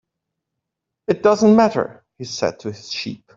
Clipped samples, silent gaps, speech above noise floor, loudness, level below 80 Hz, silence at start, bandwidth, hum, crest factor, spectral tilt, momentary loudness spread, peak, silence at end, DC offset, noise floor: under 0.1%; none; 63 dB; -18 LUFS; -60 dBFS; 1.1 s; 7.6 kHz; none; 18 dB; -5.5 dB/octave; 18 LU; -2 dBFS; 0.2 s; under 0.1%; -81 dBFS